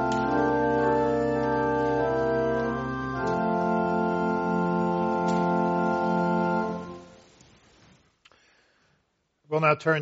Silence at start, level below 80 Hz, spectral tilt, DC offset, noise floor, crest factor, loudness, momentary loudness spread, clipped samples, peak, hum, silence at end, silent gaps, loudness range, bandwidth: 0 s; -52 dBFS; -6 dB/octave; under 0.1%; -72 dBFS; 18 dB; -25 LUFS; 6 LU; under 0.1%; -8 dBFS; none; 0 s; none; 7 LU; 7.6 kHz